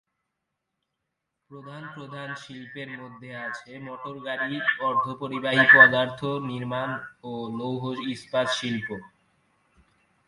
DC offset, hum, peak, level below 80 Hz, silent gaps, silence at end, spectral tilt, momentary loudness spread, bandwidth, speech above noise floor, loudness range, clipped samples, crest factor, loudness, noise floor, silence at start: under 0.1%; none; -2 dBFS; -68 dBFS; none; 1.2 s; -5 dB/octave; 24 LU; 11.5 kHz; 56 dB; 18 LU; under 0.1%; 26 dB; -22 LUFS; -82 dBFS; 1.5 s